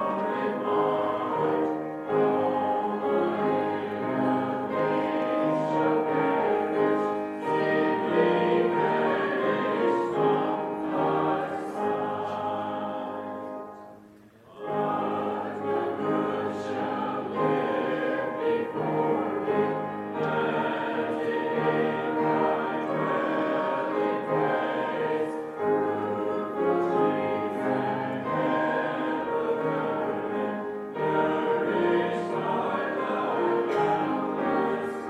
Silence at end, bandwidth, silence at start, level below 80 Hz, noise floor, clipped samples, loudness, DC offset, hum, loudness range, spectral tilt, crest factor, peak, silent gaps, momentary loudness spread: 0 s; 11 kHz; 0 s; -70 dBFS; -52 dBFS; under 0.1%; -27 LUFS; under 0.1%; none; 5 LU; -7.5 dB/octave; 16 dB; -10 dBFS; none; 6 LU